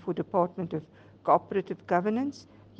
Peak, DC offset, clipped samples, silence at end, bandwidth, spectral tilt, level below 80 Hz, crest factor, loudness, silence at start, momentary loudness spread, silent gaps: -10 dBFS; under 0.1%; under 0.1%; 0.35 s; 8 kHz; -8 dB/octave; -70 dBFS; 20 dB; -29 LUFS; 0 s; 10 LU; none